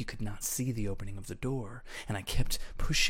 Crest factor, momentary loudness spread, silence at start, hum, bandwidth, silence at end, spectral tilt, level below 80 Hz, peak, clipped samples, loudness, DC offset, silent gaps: 18 dB; 9 LU; 0 s; none; 16.5 kHz; 0 s; -3.5 dB/octave; -38 dBFS; -14 dBFS; under 0.1%; -36 LUFS; under 0.1%; none